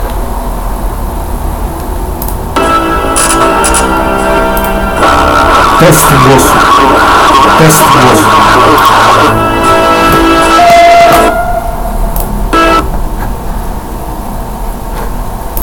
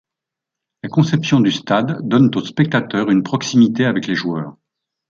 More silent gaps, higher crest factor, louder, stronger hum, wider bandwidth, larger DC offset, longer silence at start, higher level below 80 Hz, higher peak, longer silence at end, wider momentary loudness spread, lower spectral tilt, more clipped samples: neither; second, 6 dB vs 16 dB; first, -6 LUFS vs -17 LUFS; neither; first, over 20 kHz vs 7.4 kHz; neither; second, 0 s vs 0.85 s; first, -16 dBFS vs -58 dBFS; about the same, 0 dBFS vs -2 dBFS; second, 0 s vs 0.6 s; first, 15 LU vs 7 LU; second, -4 dB/octave vs -6 dB/octave; first, 5% vs under 0.1%